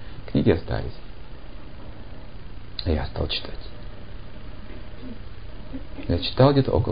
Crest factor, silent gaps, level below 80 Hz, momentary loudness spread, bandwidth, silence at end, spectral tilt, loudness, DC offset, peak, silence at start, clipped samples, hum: 22 dB; none; -36 dBFS; 24 LU; 5.2 kHz; 0 s; -11.5 dB/octave; -24 LUFS; 2%; -6 dBFS; 0 s; under 0.1%; none